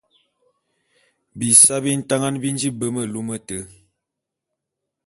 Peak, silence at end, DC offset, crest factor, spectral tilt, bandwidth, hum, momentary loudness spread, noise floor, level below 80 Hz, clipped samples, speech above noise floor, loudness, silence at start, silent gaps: 0 dBFS; 1.4 s; under 0.1%; 22 dB; -3 dB/octave; 12 kHz; none; 18 LU; -83 dBFS; -60 dBFS; under 0.1%; 63 dB; -17 LUFS; 1.35 s; none